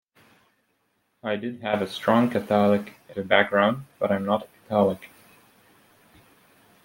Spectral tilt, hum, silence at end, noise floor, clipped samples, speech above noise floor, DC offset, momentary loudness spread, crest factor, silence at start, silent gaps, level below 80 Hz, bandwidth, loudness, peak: -6.5 dB/octave; none; 1.8 s; -71 dBFS; under 0.1%; 48 dB; under 0.1%; 10 LU; 24 dB; 1.25 s; none; -68 dBFS; 16.5 kHz; -24 LUFS; -2 dBFS